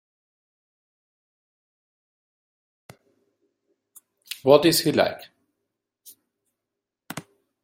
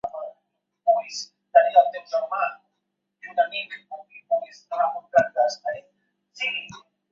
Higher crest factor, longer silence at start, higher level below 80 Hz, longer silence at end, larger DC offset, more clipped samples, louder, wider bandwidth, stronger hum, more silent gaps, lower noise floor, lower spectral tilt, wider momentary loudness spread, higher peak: about the same, 26 dB vs 22 dB; first, 4.3 s vs 0.05 s; about the same, -68 dBFS vs -72 dBFS; about the same, 0.45 s vs 0.35 s; neither; neither; first, -20 LUFS vs -24 LUFS; first, 16.5 kHz vs 7.6 kHz; neither; neither; first, -85 dBFS vs -79 dBFS; first, -4 dB/octave vs -2 dB/octave; first, 22 LU vs 18 LU; about the same, -2 dBFS vs -4 dBFS